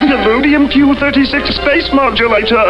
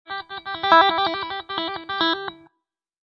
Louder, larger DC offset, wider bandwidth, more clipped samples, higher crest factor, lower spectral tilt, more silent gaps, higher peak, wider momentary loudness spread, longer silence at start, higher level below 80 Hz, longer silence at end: first, -10 LUFS vs -21 LUFS; first, 0.8% vs under 0.1%; second, 5.8 kHz vs 7 kHz; neither; second, 10 dB vs 22 dB; first, -6.5 dB/octave vs -4 dB/octave; neither; about the same, 0 dBFS vs -2 dBFS; second, 2 LU vs 16 LU; about the same, 0 s vs 0.1 s; first, -30 dBFS vs -62 dBFS; second, 0 s vs 0.7 s